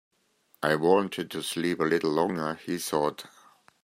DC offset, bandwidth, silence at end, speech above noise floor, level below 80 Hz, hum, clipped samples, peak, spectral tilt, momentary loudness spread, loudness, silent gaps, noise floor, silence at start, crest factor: under 0.1%; 16 kHz; 0.55 s; 40 dB; -70 dBFS; none; under 0.1%; -8 dBFS; -4.5 dB/octave; 9 LU; -27 LUFS; none; -67 dBFS; 0.6 s; 20 dB